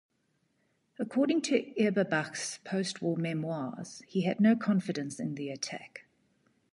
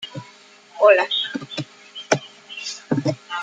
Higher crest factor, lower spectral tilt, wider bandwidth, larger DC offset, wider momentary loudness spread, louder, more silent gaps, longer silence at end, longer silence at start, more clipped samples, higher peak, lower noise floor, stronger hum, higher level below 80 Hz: about the same, 18 dB vs 22 dB; first, -5.5 dB/octave vs -4 dB/octave; first, 11.5 kHz vs 9.2 kHz; neither; second, 13 LU vs 20 LU; second, -31 LUFS vs -21 LUFS; neither; first, 0.7 s vs 0 s; first, 1 s vs 0 s; neither; second, -14 dBFS vs -2 dBFS; first, -75 dBFS vs -48 dBFS; neither; second, -78 dBFS vs -70 dBFS